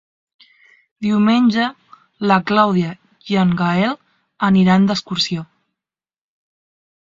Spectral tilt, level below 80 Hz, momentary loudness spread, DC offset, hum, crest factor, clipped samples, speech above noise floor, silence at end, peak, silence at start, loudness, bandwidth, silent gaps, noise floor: -6.5 dB/octave; -56 dBFS; 11 LU; under 0.1%; none; 18 dB; under 0.1%; over 75 dB; 1.75 s; 0 dBFS; 1 s; -17 LUFS; 7.6 kHz; none; under -90 dBFS